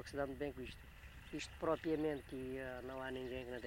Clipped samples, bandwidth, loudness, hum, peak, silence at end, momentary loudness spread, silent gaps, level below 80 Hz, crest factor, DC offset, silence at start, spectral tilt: under 0.1%; 16 kHz; -44 LUFS; none; -24 dBFS; 0 s; 13 LU; none; -60 dBFS; 20 dB; under 0.1%; 0 s; -5.5 dB/octave